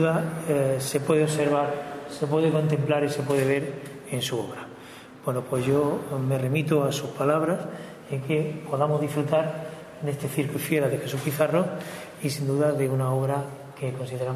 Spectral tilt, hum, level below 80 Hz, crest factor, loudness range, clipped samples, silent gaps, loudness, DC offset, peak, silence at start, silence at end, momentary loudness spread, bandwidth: -6 dB/octave; none; -64 dBFS; 18 dB; 3 LU; under 0.1%; none; -26 LUFS; under 0.1%; -8 dBFS; 0 s; 0 s; 11 LU; 14 kHz